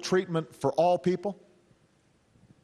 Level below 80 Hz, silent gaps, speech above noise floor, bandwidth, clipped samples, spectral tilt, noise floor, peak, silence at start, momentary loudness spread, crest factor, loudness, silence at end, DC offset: -68 dBFS; none; 39 dB; 13 kHz; under 0.1%; -6 dB/octave; -66 dBFS; -14 dBFS; 0 s; 11 LU; 16 dB; -28 LUFS; 1.3 s; under 0.1%